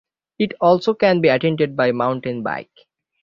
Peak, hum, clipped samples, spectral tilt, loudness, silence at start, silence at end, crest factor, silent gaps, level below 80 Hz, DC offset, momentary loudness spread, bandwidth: -2 dBFS; none; under 0.1%; -7.5 dB/octave; -18 LUFS; 0.4 s; 0.6 s; 18 dB; none; -60 dBFS; under 0.1%; 9 LU; 7.2 kHz